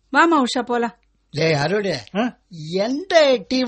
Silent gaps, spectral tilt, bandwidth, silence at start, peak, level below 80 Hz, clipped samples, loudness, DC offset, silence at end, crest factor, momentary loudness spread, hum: none; -5 dB/octave; 8.8 kHz; 0.1 s; -2 dBFS; -58 dBFS; under 0.1%; -19 LUFS; under 0.1%; 0 s; 18 dB; 12 LU; none